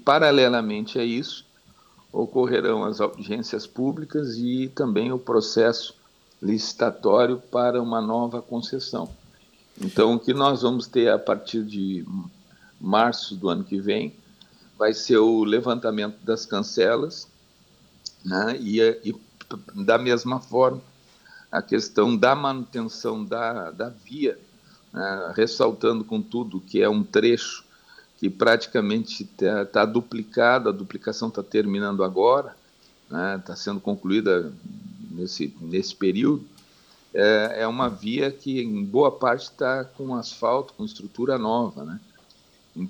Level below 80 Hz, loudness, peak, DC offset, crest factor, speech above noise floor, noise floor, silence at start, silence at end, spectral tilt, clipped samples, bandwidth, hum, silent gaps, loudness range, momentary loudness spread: -64 dBFS; -24 LUFS; -4 dBFS; under 0.1%; 20 dB; 34 dB; -57 dBFS; 0.05 s; 0 s; -5.5 dB/octave; under 0.1%; 19 kHz; none; none; 3 LU; 14 LU